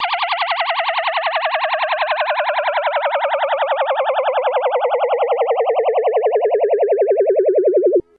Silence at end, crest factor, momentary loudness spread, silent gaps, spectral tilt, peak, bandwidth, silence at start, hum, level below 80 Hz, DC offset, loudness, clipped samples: 0.15 s; 10 dB; 4 LU; none; 2 dB/octave; -6 dBFS; 5 kHz; 0 s; none; -70 dBFS; under 0.1%; -17 LUFS; under 0.1%